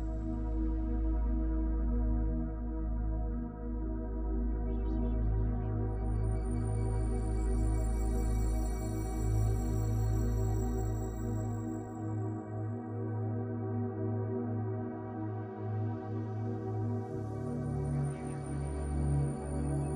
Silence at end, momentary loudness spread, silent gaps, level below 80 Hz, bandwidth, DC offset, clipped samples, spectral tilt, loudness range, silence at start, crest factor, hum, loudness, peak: 0 s; 6 LU; none; -36 dBFS; 16 kHz; under 0.1%; under 0.1%; -8.5 dB/octave; 3 LU; 0 s; 12 dB; none; -36 LUFS; -20 dBFS